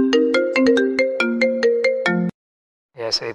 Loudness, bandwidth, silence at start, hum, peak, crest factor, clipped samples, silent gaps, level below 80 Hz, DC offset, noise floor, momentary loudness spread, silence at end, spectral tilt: -18 LUFS; 10.5 kHz; 0 s; none; -6 dBFS; 14 dB; under 0.1%; 2.34-2.89 s; -62 dBFS; under 0.1%; under -90 dBFS; 7 LU; 0 s; -5 dB/octave